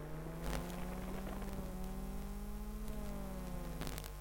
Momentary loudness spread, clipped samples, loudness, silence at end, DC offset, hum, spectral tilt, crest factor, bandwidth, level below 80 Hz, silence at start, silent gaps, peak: 4 LU; under 0.1%; -46 LUFS; 0 s; under 0.1%; none; -5.5 dB/octave; 24 dB; 17 kHz; -46 dBFS; 0 s; none; -20 dBFS